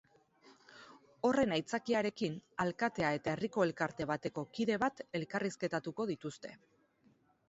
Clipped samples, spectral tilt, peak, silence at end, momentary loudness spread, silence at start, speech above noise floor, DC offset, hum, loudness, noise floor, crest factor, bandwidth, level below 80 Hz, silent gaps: under 0.1%; -4.5 dB/octave; -18 dBFS; 0.95 s; 10 LU; 0.45 s; 35 dB; under 0.1%; none; -36 LUFS; -70 dBFS; 20 dB; 8 kHz; -70 dBFS; none